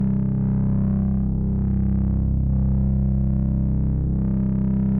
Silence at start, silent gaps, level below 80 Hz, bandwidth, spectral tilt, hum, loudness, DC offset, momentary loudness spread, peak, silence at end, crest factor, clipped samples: 0 s; none; -26 dBFS; 2.3 kHz; -14 dB/octave; none; -22 LUFS; under 0.1%; 2 LU; -12 dBFS; 0 s; 8 dB; under 0.1%